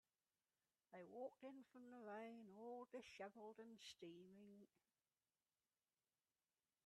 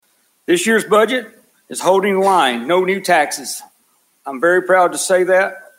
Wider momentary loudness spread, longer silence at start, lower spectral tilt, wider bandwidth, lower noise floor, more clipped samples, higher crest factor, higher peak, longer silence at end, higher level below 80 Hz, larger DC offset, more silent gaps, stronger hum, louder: second, 8 LU vs 14 LU; first, 0.9 s vs 0.5 s; about the same, -4.5 dB/octave vs -3.5 dB/octave; second, 11.5 kHz vs 16 kHz; first, under -90 dBFS vs -59 dBFS; neither; about the same, 18 dB vs 14 dB; second, -44 dBFS vs -2 dBFS; first, 2.2 s vs 0.2 s; second, under -90 dBFS vs -68 dBFS; neither; neither; neither; second, -60 LUFS vs -15 LUFS